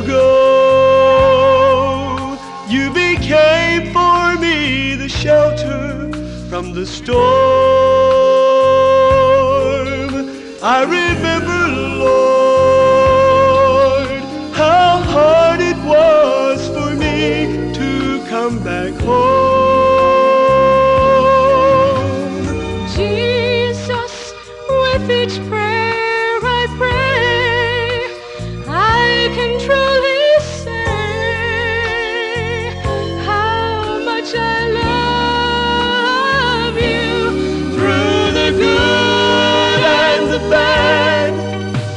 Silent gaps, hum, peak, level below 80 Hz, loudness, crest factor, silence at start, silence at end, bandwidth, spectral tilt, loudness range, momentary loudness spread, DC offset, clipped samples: none; none; -2 dBFS; -34 dBFS; -13 LUFS; 10 dB; 0 s; 0 s; 10 kHz; -5 dB/octave; 5 LU; 10 LU; under 0.1%; under 0.1%